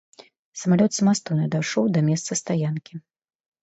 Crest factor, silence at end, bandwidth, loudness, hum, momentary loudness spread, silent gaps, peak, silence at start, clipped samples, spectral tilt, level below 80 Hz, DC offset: 16 dB; 0.65 s; 8.2 kHz; -23 LUFS; none; 16 LU; none; -8 dBFS; 0.55 s; under 0.1%; -5.5 dB/octave; -66 dBFS; under 0.1%